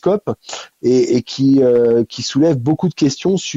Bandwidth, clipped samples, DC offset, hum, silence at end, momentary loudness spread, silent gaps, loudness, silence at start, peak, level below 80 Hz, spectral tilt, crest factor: 8 kHz; under 0.1%; under 0.1%; none; 0 s; 9 LU; none; -15 LUFS; 0.05 s; -4 dBFS; -54 dBFS; -6 dB/octave; 10 dB